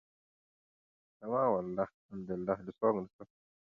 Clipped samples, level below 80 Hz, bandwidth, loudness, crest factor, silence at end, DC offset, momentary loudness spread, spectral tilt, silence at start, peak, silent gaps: under 0.1%; -70 dBFS; 4.8 kHz; -35 LUFS; 20 dB; 0.4 s; under 0.1%; 15 LU; -9 dB/octave; 1.2 s; -18 dBFS; 1.94-2.09 s, 3.13-3.19 s